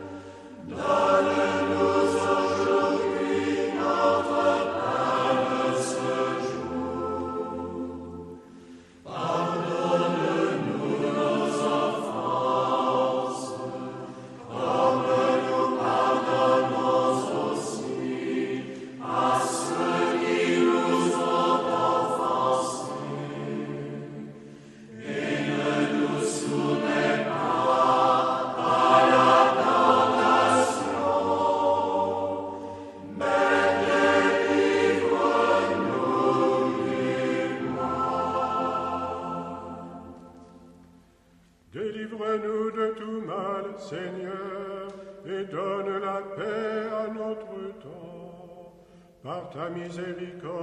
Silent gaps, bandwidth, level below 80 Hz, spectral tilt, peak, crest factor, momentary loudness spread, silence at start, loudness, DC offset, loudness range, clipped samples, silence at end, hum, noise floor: none; 12 kHz; -64 dBFS; -5 dB/octave; -6 dBFS; 20 dB; 16 LU; 0 s; -25 LUFS; under 0.1%; 11 LU; under 0.1%; 0 s; none; -59 dBFS